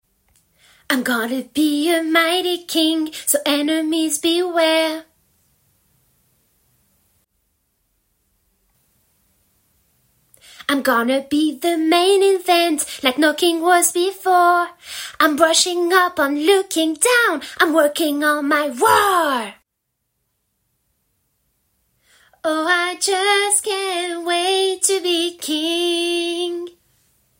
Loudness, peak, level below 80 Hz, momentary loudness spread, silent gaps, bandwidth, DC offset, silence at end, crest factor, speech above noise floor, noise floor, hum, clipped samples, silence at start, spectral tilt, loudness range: -17 LUFS; 0 dBFS; -64 dBFS; 8 LU; none; 16.5 kHz; under 0.1%; 0.7 s; 18 dB; 58 dB; -75 dBFS; none; under 0.1%; 0.9 s; -1 dB/octave; 8 LU